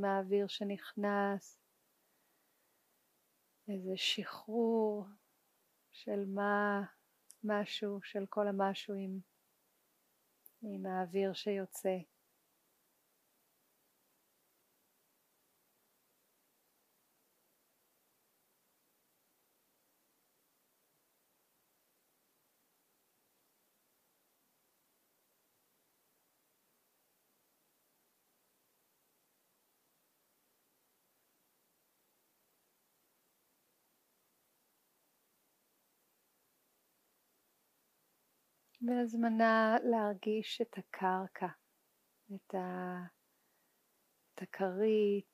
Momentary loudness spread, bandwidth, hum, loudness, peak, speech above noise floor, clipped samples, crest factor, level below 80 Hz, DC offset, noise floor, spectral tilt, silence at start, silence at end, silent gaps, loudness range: 14 LU; 15.5 kHz; none; -36 LUFS; -18 dBFS; 41 dB; under 0.1%; 24 dB; under -90 dBFS; under 0.1%; -77 dBFS; -5.5 dB/octave; 0 s; 0.1 s; none; 9 LU